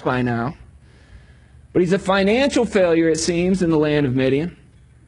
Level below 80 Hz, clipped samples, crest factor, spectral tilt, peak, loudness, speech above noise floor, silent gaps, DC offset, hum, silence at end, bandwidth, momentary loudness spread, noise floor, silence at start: -44 dBFS; under 0.1%; 16 dB; -5.5 dB/octave; -4 dBFS; -18 LUFS; 29 dB; none; under 0.1%; none; 0.55 s; 11 kHz; 7 LU; -47 dBFS; 0 s